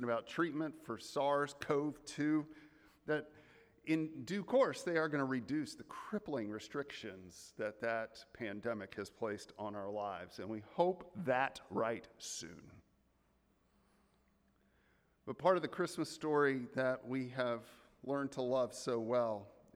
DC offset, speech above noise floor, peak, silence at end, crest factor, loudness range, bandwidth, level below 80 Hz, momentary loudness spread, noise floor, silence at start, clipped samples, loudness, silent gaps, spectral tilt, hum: under 0.1%; 37 dB; -18 dBFS; 0.25 s; 20 dB; 6 LU; 15 kHz; -76 dBFS; 13 LU; -75 dBFS; 0 s; under 0.1%; -39 LUFS; none; -5.5 dB/octave; none